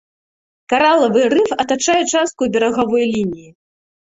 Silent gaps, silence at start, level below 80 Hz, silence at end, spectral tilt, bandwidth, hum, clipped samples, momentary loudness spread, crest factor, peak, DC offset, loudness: none; 0.7 s; -54 dBFS; 0.75 s; -3.5 dB/octave; 8.2 kHz; none; under 0.1%; 7 LU; 16 dB; 0 dBFS; under 0.1%; -15 LUFS